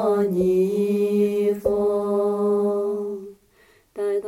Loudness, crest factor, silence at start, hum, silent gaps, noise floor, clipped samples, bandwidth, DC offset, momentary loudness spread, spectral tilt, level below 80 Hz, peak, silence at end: -22 LUFS; 14 dB; 0 s; none; none; -57 dBFS; under 0.1%; 15 kHz; under 0.1%; 9 LU; -8 dB/octave; -54 dBFS; -8 dBFS; 0 s